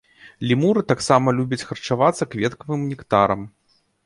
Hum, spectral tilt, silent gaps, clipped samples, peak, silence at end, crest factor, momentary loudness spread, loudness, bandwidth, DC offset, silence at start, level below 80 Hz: none; -6 dB/octave; none; under 0.1%; -2 dBFS; 0.55 s; 20 dB; 9 LU; -21 LUFS; 11.5 kHz; under 0.1%; 0.25 s; -54 dBFS